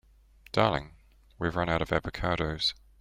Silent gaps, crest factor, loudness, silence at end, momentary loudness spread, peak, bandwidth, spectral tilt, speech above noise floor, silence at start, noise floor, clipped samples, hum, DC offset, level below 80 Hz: none; 22 dB; -30 LUFS; 0.25 s; 6 LU; -8 dBFS; 15.5 kHz; -5.5 dB/octave; 29 dB; 0.55 s; -58 dBFS; under 0.1%; none; under 0.1%; -46 dBFS